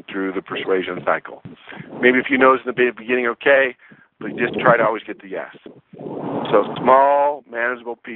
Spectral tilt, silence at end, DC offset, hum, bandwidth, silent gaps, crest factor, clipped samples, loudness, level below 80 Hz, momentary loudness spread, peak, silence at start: -9 dB/octave; 0 s; under 0.1%; none; 4.2 kHz; none; 18 dB; under 0.1%; -18 LUFS; -64 dBFS; 19 LU; 0 dBFS; 0.1 s